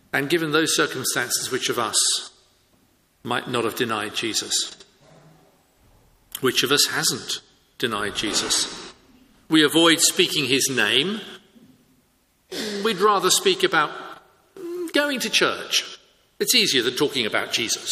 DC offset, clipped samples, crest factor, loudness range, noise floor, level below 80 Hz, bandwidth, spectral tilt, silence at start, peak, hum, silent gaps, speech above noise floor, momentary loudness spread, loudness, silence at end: under 0.1%; under 0.1%; 22 dB; 6 LU; -63 dBFS; -62 dBFS; 15.5 kHz; -2 dB/octave; 0.15 s; -2 dBFS; none; none; 42 dB; 14 LU; -21 LUFS; 0 s